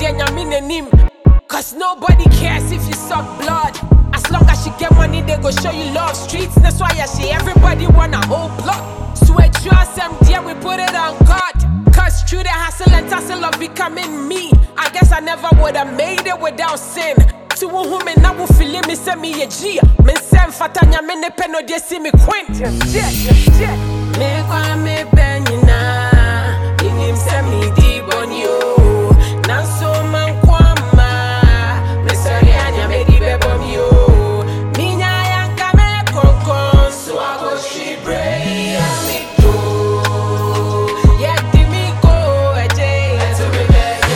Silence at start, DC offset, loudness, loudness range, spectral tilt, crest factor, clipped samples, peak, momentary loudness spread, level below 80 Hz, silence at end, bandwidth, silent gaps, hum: 0 s; under 0.1%; -13 LUFS; 2 LU; -5.5 dB/octave; 10 dB; under 0.1%; 0 dBFS; 8 LU; -14 dBFS; 0 s; 17 kHz; none; none